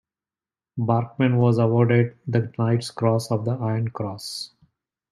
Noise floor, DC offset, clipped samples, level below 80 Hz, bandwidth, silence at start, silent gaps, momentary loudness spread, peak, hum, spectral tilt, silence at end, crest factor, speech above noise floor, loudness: under -90 dBFS; under 0.1%; under 0.1%; -62 dBFS; 12.5 kHz; 0.75 s; none; 13 LU; -6 dBFS; none; -7.5 dB/octave; 0.65 s; 18 dB; over 68 dB; -23 LUFS